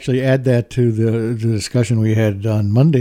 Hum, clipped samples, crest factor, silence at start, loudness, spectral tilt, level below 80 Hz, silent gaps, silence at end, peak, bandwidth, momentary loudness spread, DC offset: none; under 0.1%; 14 dB; 0 s; -17 LUFS; -7.5 dB/octave; -48 dBFS; none; 0 s; -2 dBFS; 14 kHz; 4 LU; under 0.1%